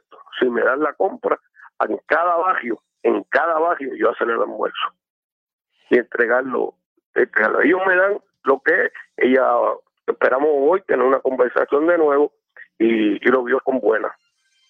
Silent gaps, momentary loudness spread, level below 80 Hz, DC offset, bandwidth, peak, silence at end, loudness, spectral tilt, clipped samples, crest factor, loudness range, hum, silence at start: 5.10-5.47 s, 5.53-5.59 s, 6.86-6.96 s, 7.05-7.13 s; 8 LU; -74 dBFS; under 0.1%; 5.4 kHz; -2 dBFS; 0.55 s; -19 LUFS; -7 dB/octave; under 0.1%; 16 dB; 4 LU; none; 0.35 s